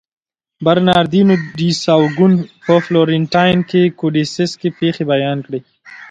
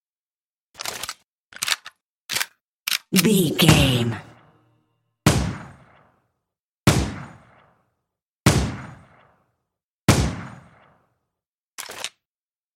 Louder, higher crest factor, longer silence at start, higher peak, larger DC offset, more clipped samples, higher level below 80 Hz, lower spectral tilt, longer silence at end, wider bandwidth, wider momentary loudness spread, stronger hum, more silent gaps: first, -14 LUFS vs -22 LUFS; second, 14 dB vs 24 dB; second, 0.6 s vs 0.8 s; about the same, 0 dBFS vs 0 dBFS; neither; neither; second, -50 dBFS vs -38 dBFS; first, -6.5 dB/octave vs -4.5 dB/octave; second, 0.05 s vs 0.65 s; second, 9 kHz vs 16.5 kHz; second, 7 LU vs 21 LU; neither; second, none vs 1.28-1.50 s, 2.02-2.29 s, 2.67-2.85 s, 6.62-6.84 s, 8.22-8.46 s, 9.84-10.08 s, 11.47-11.78 s